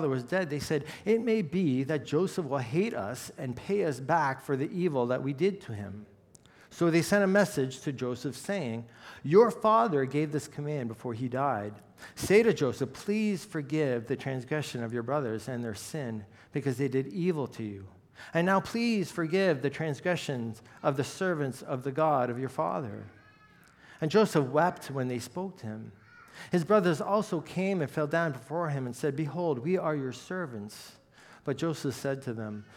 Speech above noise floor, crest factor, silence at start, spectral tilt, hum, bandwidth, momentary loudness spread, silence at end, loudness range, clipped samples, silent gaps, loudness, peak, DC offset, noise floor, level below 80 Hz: 29 dB; 20 dB; 0 s; -6 dB/octave; none; 16.5 kHz; 14 LU; 0 s; 5 LU; under 0.1%; none; -30 LUFS; -10 dBFS; under 0.1%; -59 dBFS; -68 dBFS